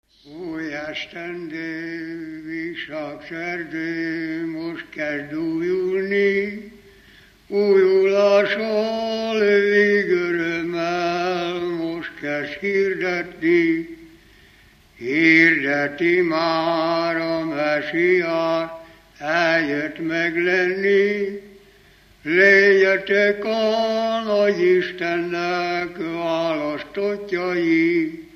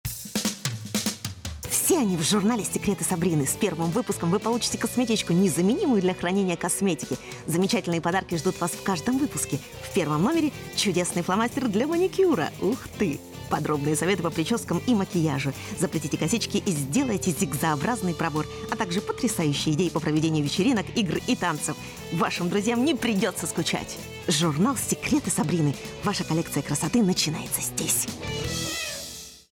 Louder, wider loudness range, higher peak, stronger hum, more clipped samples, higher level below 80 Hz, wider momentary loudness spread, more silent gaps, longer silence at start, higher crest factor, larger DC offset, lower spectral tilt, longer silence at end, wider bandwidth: first, -20 LUFS vs -25 LUFS; first, 9 LU vs 2 LU; first, -2 dBFS vs -12 dBFS; neither; neither; second, -60 dBFS vs -52 dBFS; first, 14 LU vs 7 LU; neither; first, 0.25 s vs 0.05 s; about the same, 18 dB vs 14 dB; neither; about the same, -5.5 dB/octave vs -4.5 dB/octave; about the same, 0.1 s vs 0.2 s; second, 6.8 kHz vs over 20 kHz